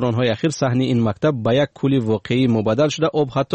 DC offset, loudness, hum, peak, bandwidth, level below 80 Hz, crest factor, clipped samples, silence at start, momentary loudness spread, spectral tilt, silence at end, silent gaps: under 0.1%; -19 LUFS; none; -6 dBFS; 8.4 kHz; -52 dBFS; 12 dB; under 0.1%; 0 s; 2 LU; -6.5 dB/octave; 0 s; none